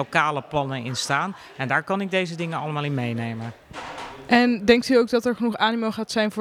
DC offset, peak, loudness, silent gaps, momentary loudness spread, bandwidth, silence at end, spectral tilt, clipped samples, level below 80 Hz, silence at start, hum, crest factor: under 0.1%; -2 dBFS; -23 LUFS; none; 16 LU; 15 kHz; 0 s; -5 dB/octave; under 0.1%; -56 dBFS; 0 s; none; 22 dB